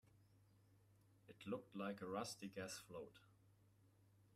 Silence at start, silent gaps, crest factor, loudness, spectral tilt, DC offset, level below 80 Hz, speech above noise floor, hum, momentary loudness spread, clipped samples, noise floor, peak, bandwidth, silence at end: 0.05 s; none; 20 dB; -51 LUFS; -4.5 dB/octave; under 0.1%; -86 dBFS; 23 dB; none; 10 LU; under 0.1%; -74 dBFS; -34 dBFS; 15 kHz; 0 s